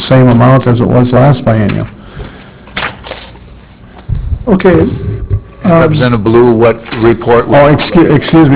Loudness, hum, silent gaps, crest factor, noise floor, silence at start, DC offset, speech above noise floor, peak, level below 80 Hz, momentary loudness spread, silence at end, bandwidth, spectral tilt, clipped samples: -8 LUFS; none; none; 8 dB; -33 dBFS; 0 s; under 0.1%; 27 dB; 0 dBFS; -26 dBFS; 16 LU; 0 s; 4 kHz; -11.5 dB/octave; 0.6%